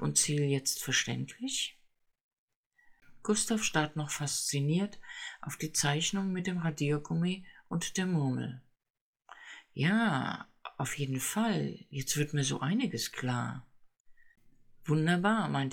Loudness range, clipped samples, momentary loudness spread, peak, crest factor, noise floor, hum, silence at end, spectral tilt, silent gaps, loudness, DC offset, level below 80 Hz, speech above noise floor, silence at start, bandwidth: 3 LU; under 0.1%; 13 LU; -14 dBFS; 20 dB; -65 dBFS; none; 0 s; -4 dB/octave; 2.23-2.31 s, 2.38-2.48 s, 2.56-2.71 s, 8.90-8.94 s, 9.01-9.13 s, 14.00-14.05 s; -32 LUFS; under 0.1%; -64 dBFS; 33 dB; 0 s; 19 kHz